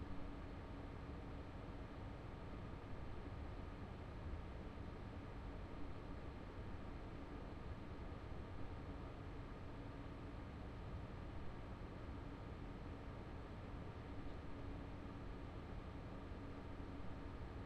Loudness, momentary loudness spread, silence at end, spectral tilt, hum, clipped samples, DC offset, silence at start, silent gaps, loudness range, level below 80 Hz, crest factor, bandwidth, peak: -53 LUFS; 1 LU; 0 s; -8 dB/octave; none; under 0.1%; under 0.1%; 0 s; none; 0 LU; -56 dBFS; 14 dB; 10.5 kHz; -36 dBFS